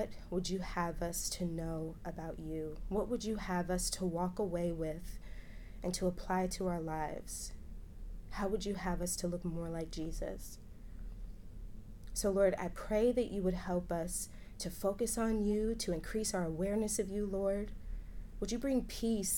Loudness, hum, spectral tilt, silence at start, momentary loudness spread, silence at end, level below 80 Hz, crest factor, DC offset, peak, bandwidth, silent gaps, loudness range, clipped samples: -37 LUFS; none; -5 dB/octave; 0 s; 18 LU; 0 s; -48 dBFS; 18 dB; under 0.1%; -20 dBFS; 19 kHz; none; 5 LU; under 0.1%